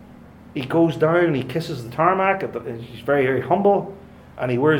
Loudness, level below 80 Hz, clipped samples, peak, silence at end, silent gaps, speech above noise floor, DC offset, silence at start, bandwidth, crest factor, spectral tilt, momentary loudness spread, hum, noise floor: -21 LUFS; -56 dBFS; under 0.1%; -2 dBFS; 0 s; none; 24 dB; under 0.1%; 0 s; 16.5 kHz; 20 dB; -7.5 dB/octave; 13 LU; none; -44 dBFS